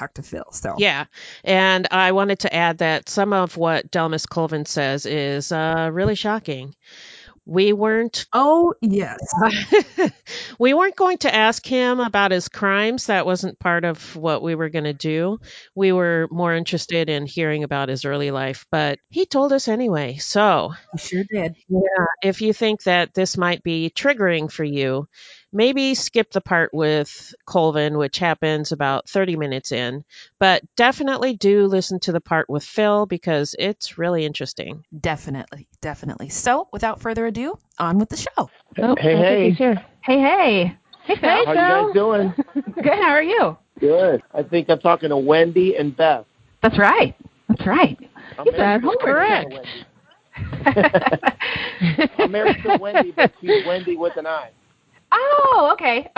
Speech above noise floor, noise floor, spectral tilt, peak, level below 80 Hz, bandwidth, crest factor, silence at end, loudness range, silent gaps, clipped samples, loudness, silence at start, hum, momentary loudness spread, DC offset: 39 dB; -58 dBFS; -5 dB/octave; 0 dBFS; -52 dBFS; 8 kHz; 20 dB; 0.1 s; 5 LU; none; under 0.1%; -19 LUFS; 0 s; none; 11 LU; under 0.1%